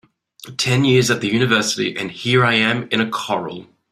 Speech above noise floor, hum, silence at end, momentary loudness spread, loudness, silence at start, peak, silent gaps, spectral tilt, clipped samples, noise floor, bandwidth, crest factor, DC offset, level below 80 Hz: 23 dB; none; 0.3 s; 10 LU; -17 LUFS; 0.4 s; -2 dBFS; none; -4.5 dB/octave; under 0.1%; -41 dBFS; 14.5 kHz; 18 dB; under 0.1%; -56 dBFS